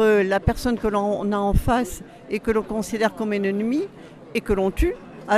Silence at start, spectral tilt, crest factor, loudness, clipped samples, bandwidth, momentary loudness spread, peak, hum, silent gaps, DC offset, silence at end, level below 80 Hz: 0 s; -6 dB/octave; 18 dB; -23 LUFS; under 0.1%; 15 kHz; 9 LU; -4 dBFS; none; none; under 0.1%; 0 s; -32 dBFS